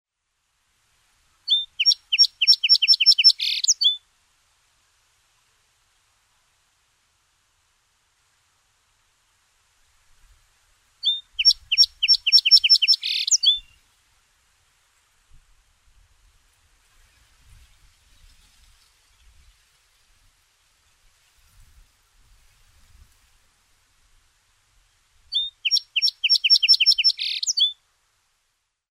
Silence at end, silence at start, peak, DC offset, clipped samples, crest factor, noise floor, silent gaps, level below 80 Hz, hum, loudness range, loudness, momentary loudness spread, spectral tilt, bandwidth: 1.2 s; 1.5 s; -4 dBFS; under 0.1%; under 0.1%; 20 dB; -75 dBFS; none; -62 dBFS; none; 12 LU; -16 LUFS; 11 LU; 6 dB/octave; 16 kHz